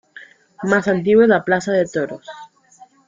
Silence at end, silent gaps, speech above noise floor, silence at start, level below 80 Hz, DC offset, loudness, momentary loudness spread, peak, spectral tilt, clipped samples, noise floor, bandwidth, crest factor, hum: 0.6 s; none; 32 dB; 0.15 s; -58 dBFS; under 0.1%; -17 LUFS; 15 LU; -2 dBFS; -6 dB/octave; under 0.1%; -49 dBFS; 7.6 kHz; 16 dB; none